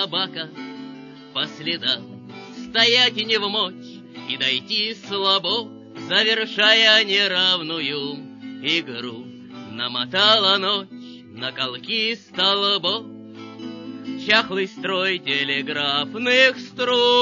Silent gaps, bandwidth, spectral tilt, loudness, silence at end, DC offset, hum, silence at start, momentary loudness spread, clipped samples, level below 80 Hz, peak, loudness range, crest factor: none; 7.4 kHz; -3 dB/octave; -19 LUFS; 0 s; under 0.1%; none; 0 s; 22 LU; under 0.1%; -72 dBFS; -2 dBFS; 5 LU; 20 dB